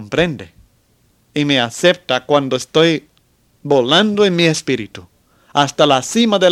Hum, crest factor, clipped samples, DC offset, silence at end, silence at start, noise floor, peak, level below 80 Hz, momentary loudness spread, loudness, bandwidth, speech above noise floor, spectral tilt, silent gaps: none; 16 dB; under 0.1%; under 0.1%; 0 s; 0 s; -57 dBFS; 0 dBFS; -52 dBFS; 10 LU; -15 LUFS; 15 kHz; 43 dB; -4.5 dB/octave; none